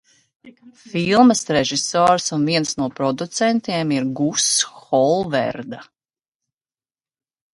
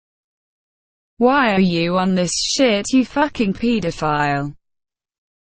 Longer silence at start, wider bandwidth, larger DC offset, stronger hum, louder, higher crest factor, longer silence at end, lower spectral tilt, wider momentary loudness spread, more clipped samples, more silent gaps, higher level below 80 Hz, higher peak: second, 0.45 s vs 1.2 s; first, 11.5 kHz vs 9.6 kHz; neither; neither; about the same, -18 LUFS vs -18 LUFS; about the same, 20 dB vs 16 dB; first, 1.7 s vs 0.95 s; about the same, -3.5 dB/octave vs -4.5 dB/octave; first, 10 LU vs 5 LU; neither; neither; second, -58 dBFS vs -46 dBFS; about the same, 0 dBFS vs -2 dBFS